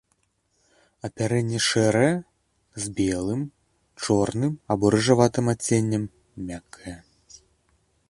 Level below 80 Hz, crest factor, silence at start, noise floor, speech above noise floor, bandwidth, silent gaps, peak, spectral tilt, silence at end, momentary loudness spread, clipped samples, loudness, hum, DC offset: -52 dBFS; 22 dB; 1.05 s; -70 dBFS; 47 dB; 11.5 kHz; none; -2 dBFS; -5 dB/octave; 1.1 s; 18 LU; under 0.1%; -23 LUFS; none; under 0.1%